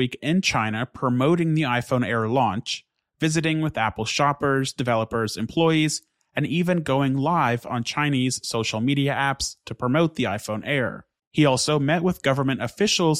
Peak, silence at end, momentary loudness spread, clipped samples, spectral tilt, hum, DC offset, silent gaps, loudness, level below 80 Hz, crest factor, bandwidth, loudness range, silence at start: -6 dBFS; 0 s; 7 LU; under 0.1%; -5 dB/octave; none; under 0.1%; 11.27-11.31 s; -23 LUFS; -54 dBFS; 16 dB; 15 kHz; 1 LU; 0 s